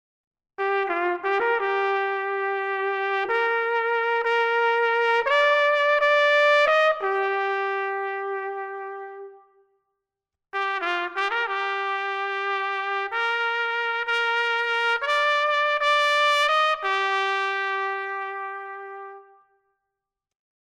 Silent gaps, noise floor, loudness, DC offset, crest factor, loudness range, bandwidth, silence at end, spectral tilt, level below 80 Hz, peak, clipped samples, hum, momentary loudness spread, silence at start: none; -87 dBFS; -23 LUFS; under 0.1%; 16 dB; 10 LU; 13 kHz; 1.5 s; -0.5 dB/octave; -72 dBFS; -8 dBFS; under 0.1%; none; 12 LU; 0.6 s